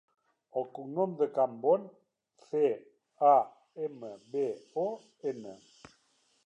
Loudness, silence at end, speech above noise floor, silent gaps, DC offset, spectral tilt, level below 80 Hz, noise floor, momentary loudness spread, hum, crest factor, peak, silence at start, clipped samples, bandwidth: -32 LUFS; 0.9 s; 40 dB; none; under 0.1%; -7.5 dB/octave; -84 dBFS; -71 dBFS; 15 LU; none; 20 dB; -12 dBFS; 0.55 s; under 0.1%; 8.4 kHz